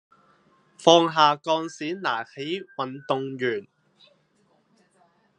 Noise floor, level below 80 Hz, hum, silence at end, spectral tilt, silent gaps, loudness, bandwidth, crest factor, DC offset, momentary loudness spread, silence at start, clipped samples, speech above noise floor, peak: -65 dBFS; -80 dBFS; none; 1.75 s; -4 dB/octave; none; -24 LUFS; 10 kHz; 24 dB; under 0.1%; 14 LU; 0.8 s; under 0.1%; 42 dB; -2 dBFS